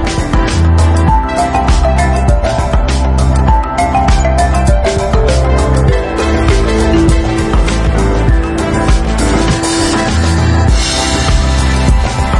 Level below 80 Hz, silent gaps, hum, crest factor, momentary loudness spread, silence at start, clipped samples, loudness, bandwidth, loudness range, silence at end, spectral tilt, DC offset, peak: -14 dBFS; none; none; 10 dB; 3 LU; 0 s; under 0.1%; -11 LUFS; 11.5 kHz; 1 LU; 0 s; -5.5 dB/octave; under 0.1%; 0 dBFS